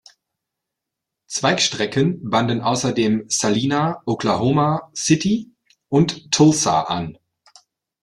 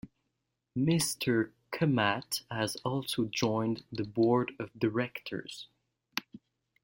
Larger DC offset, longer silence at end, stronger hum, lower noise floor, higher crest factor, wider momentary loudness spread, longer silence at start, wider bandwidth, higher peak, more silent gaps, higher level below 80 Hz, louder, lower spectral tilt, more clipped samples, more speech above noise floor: neither; first, 0.9 s vs 0.45 s; neither; about the same, -83 dBFS vs -83 dBFS; about the same, 18 dB vs 22 dB; second, 7 LU vs 12 LU; first, 1.3 s vs 0.05 s; second, 12.5 kHz vs 16.5 kHz; first, -2 dBFS vs -10 dBFS; neither; first, -56 dBFS vs -68 dBFS; first, -19 LUFS vs -32 LUFS; about the same, -4.5 dB/octave vs -5 dB/octave; neither; first, 64 dB vs 52 dB